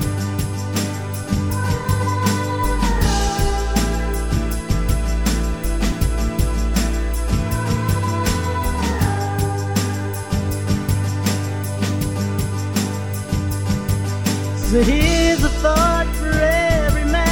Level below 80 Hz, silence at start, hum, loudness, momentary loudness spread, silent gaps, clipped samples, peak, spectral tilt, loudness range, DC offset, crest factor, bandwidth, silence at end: -24 dBFS; 0 s; none; -20 LUFS; 7 LU; none; under 0.1%; -2 dBFS; -5.5 dB/octave; 4 LU; 0.2%; 16 dB; 19 kHz; 0 s